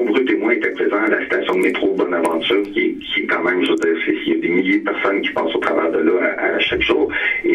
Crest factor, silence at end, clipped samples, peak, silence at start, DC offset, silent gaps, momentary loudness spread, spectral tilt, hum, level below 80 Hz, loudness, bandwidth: 16 dB; 0 s; under 0.1%; 0 dBFS; 0 s; under 0.1%; none; 3 LU; -5 dB/octave; none; -50 dBFS; -17 LUFS; 11.5 kHz